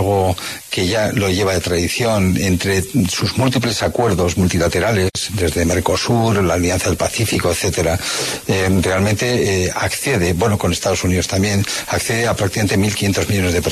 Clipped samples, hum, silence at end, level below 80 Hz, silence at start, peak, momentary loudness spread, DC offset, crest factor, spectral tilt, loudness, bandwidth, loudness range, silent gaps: under 0.1%; none; 0 s; -36 dBFS; 0 s; -2 dBFS; 3 LU; under 0.1%; 16 dB; -4.5 dB/octave; -17 LUFS; 13.5 kHz; 1 LU; none